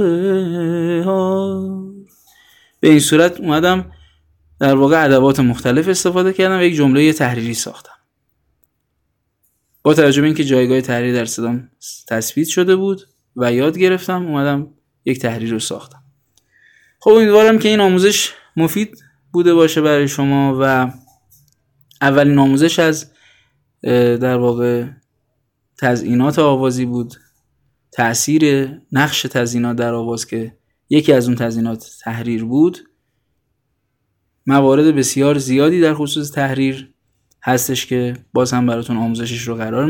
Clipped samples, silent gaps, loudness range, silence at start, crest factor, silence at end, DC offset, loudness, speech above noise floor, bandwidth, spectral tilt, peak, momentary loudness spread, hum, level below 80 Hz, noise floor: under 0.1%; none; 5 LU; 0 s; 16 dB; 0 s; under 0.1%; -15 LUFS; 55 dB; 17.5 kHz; -5 dB/octave; 0 dBFS; 11 LU; none; -52 dBFS; -69 dBFS